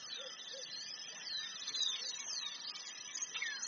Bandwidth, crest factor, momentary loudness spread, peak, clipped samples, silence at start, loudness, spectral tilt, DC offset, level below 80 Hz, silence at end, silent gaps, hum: 7.2 kHz; 20 dB; 9 LU; -24 dBFS; under 0.1%; 0 s; -41 LUFS; 3.5 dB/octave; under 0.1%; under -90 dBFS; 0 s; none; none